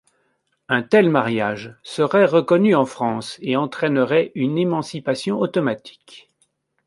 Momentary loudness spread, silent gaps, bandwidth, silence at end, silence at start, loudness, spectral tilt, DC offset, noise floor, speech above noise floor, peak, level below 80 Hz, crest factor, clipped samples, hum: 9 LU; none; 11.5 kHz; 0.65 s; 0.7 s; -19 LUFS; -6.5 dB/octave; under 0.1%; -68 dBFS; 49 dB; -2 dBFS; -66 dBFS; 18 dB; under 0.1%; none